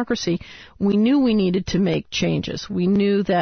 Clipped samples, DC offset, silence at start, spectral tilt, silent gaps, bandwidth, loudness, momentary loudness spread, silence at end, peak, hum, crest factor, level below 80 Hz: under 0.1%; under 0.1%; 0 s; -6 dB/octave; none; 6.6 kHz; -20 LUFS; 8 LU; 0 s; -8 dBFS; none; 12 dB; -46 dBFS